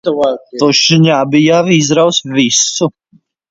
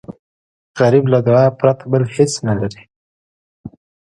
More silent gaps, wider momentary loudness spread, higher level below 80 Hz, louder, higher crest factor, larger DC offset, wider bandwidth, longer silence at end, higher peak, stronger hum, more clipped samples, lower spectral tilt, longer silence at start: second, none vs 0.19-0.74 s, 2.96-3.64 s; about the same, 7 LU vs 9 LU; about the same, -54 dBFS vs -50 dBFS; first, -10 LUFS vs -15 LUFS; about the same, 12 dB vs 16 dB; neither; second, 7.8 kHz vs 11.5 kHz; first, 0.6 s vs 0.45 s; about the same, 0 dBFS vs 0 dBFS; neither; neither; second, -4 dB/octave vs -6.5 dB/octave; about the same, 0.05 s vs 0.1 s